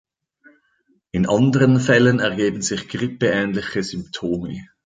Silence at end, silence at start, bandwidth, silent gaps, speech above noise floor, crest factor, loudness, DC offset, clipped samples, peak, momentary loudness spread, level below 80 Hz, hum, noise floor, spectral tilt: 0.2 s; 1.15 s; 9.4 kHz; none; 45 dB; 18 dB; -19 LUFS; under 0.1%; under 0.1%; -2 dBFS; 12 LU; -50 dBFS; none; -64 dBFS; -5.5 dB/octave